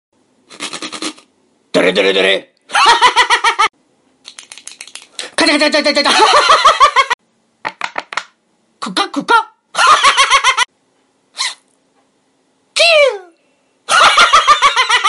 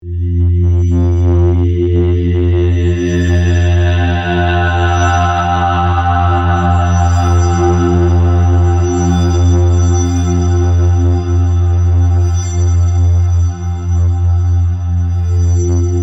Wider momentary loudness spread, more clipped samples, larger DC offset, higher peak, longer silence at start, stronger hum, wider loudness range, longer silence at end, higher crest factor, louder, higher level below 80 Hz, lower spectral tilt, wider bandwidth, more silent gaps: first, 19 LU vs 3 LU; neither; neither; about the same, 0 dBFS vs 0 dBFS; first, 0.6 s vs 0.05 s; neither; about the same, 3 LU vs 1 LU; about the same, 0 s vs 0 s; about the same, 14 dB vs 10 dB; about the same, -10 LUFS vs -12 LUFS; second, -50 dBFS vs -26 dBFS; second, -1 dB/octave vs -7 dB/octave; first, 12 kHz vs 7.8 kHz; first, 7.14-7.19 s vs none